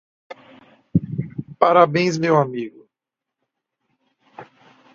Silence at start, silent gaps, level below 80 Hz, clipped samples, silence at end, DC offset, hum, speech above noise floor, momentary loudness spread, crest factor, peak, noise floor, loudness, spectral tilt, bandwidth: 0.3 s; none; -56 dBFS; under 0.1%; 0.5 s; under 0.1%; none; 68 dB; 16 LU; 22 dB; 0 dBFS; -85 dBFS; -19 LUFS; -6.5 dB/octave; 7.6 kHz